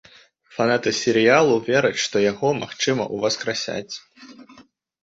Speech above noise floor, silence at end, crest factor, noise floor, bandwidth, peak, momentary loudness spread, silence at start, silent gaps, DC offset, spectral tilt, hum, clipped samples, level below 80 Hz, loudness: 32 dB; 0.4 s; 20 dB; -52 dBFS; 8 kHz; -2 dBFS; 13 LU; 0.55 s; none; under 0.1%; -4 dB/octave; none; under 0.1%; -62 dBFS; -20 LUFS